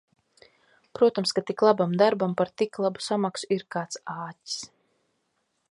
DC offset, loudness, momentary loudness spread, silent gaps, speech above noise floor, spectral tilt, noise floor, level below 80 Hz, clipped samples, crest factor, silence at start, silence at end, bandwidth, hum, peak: under 0.1%; -26 LUFS; 13 LU; none; 50 dB; -5 dB/octave; -75 dBFS; -74 dBFS; under 0.1%; 22 dB; 0.95 s; 1.05 s; 11.5 kHz; none; -6 dBFS